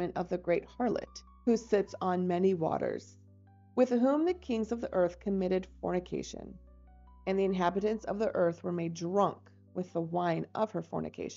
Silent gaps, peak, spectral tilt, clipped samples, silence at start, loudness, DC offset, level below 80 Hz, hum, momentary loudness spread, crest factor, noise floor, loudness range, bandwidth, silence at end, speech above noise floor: none; -16 dBFS; -6.5 dB/octave; under 0.1%; 0 s; -32 LUFS; under 0.1%; -58 dBFS; none; 10 LU; 18 dB; -58 dBFS; 3 LU; 7.6 kHz; 0 s; 27 dB